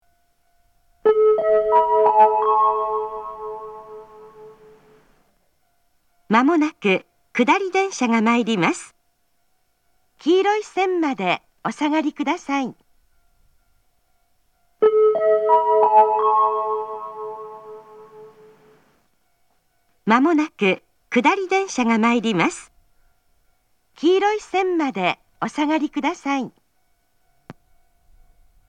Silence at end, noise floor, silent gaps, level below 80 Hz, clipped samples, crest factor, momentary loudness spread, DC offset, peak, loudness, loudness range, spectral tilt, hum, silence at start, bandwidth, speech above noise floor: 1.15 s; -69 dBFS; none; -62 dBFS; under 0.1%; 20 dB; 16 LU; under 0.1%; 0 dBFS; -19 LUFS; 9 LU; -5 dB/octave; none; 1.05 s; 10 kHz; 49 dB